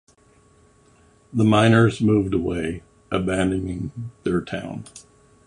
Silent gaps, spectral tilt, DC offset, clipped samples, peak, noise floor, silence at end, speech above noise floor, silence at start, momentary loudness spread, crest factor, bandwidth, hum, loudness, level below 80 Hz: none; -7 dB/octave; under 0.1%; under 0.1%; -2 dBFS; -56 dBFS; 0.45 s; 35 dB; 1.35 s; 17 LU; 20 dB; 11 kHz; none; -21 LUFS; -44 dBFS